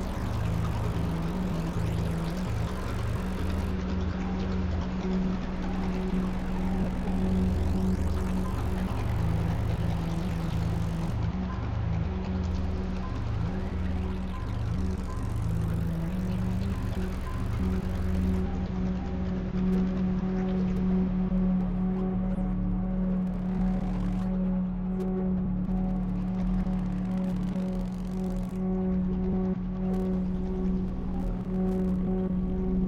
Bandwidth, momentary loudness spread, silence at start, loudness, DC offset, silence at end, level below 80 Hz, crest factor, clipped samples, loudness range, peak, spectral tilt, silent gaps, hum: 10.5 kHz; 4 LU; 0 s; -30 LUFS; under 0.1%; 0 s; -34 dBFS; 12 dB; under 0.1%; 3 LU; -16 dBFS; -8.5 dB/octave; none; none